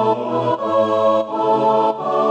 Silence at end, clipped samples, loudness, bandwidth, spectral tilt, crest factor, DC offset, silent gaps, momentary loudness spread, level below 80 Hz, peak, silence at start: 0 s; under 0.1%; -17 LUFS; 8.6 kHz; -7 dB/octave; 12 dB; under 0.1%; none; 4 LU; -72 dBFS; -4 dBFS; 0 s